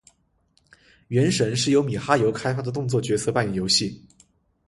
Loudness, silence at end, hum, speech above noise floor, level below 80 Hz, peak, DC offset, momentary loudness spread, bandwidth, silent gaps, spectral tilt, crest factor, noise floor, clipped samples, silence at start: -22 LUFS; 0.7 s; none; 43 dB; -54 dBFS; -2 dBFS; under 0.1%; 6 LU; 11.5 kHz; none; -4.5 dB/octave; 22 dB; -66 dBFS; under 0.1%; 1.1 s